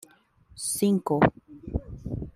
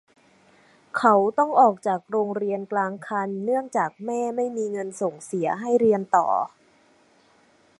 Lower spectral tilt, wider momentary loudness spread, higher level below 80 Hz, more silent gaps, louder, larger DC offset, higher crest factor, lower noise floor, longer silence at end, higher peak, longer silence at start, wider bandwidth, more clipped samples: about the same, -5.5 dB/octave vs -6 dB/octave; first, 13 LU vs 10 LU; first, -44 dBFS vs -74 dBFS; neither; second, -27 LUFS vs -23 LUFS; neither; about the same, 24 dB vs 20 dB; about the same, -58 dBFS vs -59 dBFS; second, 0.05 s vs 1.35 s; about the same, -4 dBFS vs -4 dBFS; second, 0.55 s vs 0.95 s; first, 16 kHz vs 11.5 kHz; neither